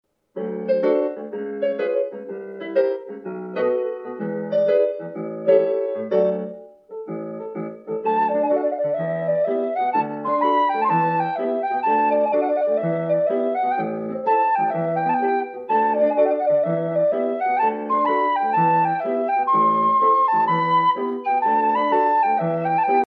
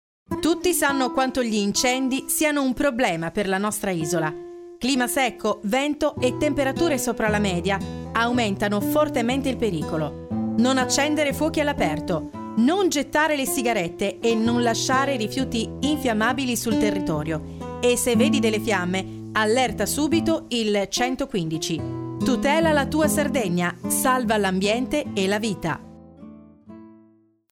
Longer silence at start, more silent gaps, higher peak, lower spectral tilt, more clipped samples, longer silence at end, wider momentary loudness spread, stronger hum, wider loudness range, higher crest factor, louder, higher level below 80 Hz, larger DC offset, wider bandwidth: about the same, 0.35 s vs 0.3 s; neither; about the same, -4 dBFS vs -6 dBFS; first, -9 dB/octave vs -4 dB/octave; neither; second, 0.05 s vs 0.6 s; first, 12 LU vs 7 LU; neither; first, 5 LU vs 2 LU; about the same, 16 dB vs 16 dB; about the same, -21 LUFS vs -22 LUFS; second, -78 dBFS vs -48 dBFS; neither; second, 5.6 kHz vs 17 kHz